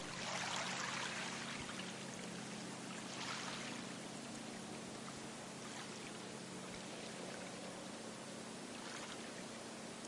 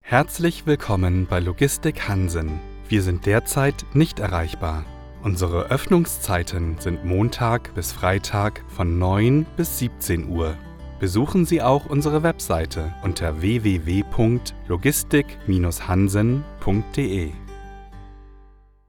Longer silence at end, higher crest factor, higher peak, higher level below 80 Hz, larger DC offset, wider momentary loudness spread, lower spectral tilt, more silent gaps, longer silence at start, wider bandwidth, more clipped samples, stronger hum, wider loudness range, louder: second, 0 s vs 0.45 s; about the same, 22 dB vs 20 dB; second, -24 dBFS vs -2 dBFS; second, -78 dBFS vs -36 dBFS; neither; about the same, 8 LU vs 9 LU; second, -2.5 dB/octave vs -6 dB/octave; neither; about the same, 0 s vs 0.05 s; second, 11.5 kHz vs over 20 kHz; neither; neither; first, 5 LU vs 2 LU; second, -46 LUFS vs -22 LUFS